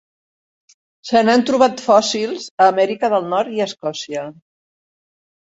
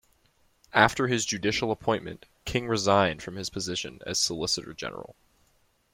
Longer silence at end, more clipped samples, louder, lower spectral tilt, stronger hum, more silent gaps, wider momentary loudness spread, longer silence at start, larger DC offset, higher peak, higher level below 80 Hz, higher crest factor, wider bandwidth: first, 1.25 s vs 0.8 s; neither; first, -17 LUFS vs -27 LUFS; about the same, -4 dB/octave vs -3.5 dB/octave; neither; first, 2.51-2.58 s vs none; about the same, 13 LU vs 14 LU; first, 1.05 s vs 0.75 s; neither; first, 0 dBFS vs -4 dBFS; second, -62 dBFS vs -54 dBFS; second, 18 dB vs 26 dB; second, 8 kHz vs 16.5 kHz